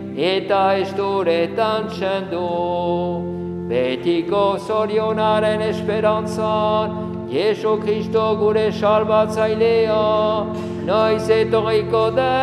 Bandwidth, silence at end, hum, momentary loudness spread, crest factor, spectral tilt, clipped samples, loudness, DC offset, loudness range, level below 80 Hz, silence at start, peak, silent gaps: 12 kHz; 0 s; none; 6 LU; 14 dB; -6.5 dB/octave; under 0.1%; -19 LUFS; under 0.1%; 3 LU; -52 dBFS; 0 s; -4 dBFS; none